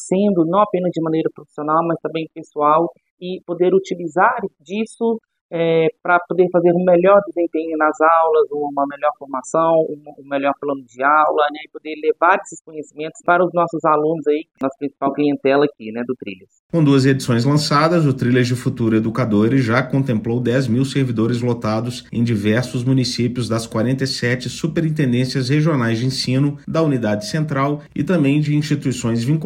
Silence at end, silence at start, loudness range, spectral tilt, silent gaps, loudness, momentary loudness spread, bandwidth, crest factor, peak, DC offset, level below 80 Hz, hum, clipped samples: 0 s; 0 s; 3 LU; -6.5 dB/octave; 3.10-3.17 s, 5.41-5.49 s, 12.61-12.65 s, 16.59-16.69 s; -18 LUFS; 11 LU; 15.5 kHz; 18 dB; 0 dBFS; under 0.1%; -54 dBFS; none; under 0.1%